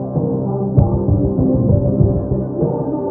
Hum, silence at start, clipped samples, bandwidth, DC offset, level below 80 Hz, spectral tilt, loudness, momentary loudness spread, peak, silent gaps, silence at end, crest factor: none; 0 s; under 0.1%; 1.7 kHz; under 0.1%; -28 dBFS; -16 dB/octave; -17 LUFS; 5 LU; 0 dBFS; none; 0 s; 16 dB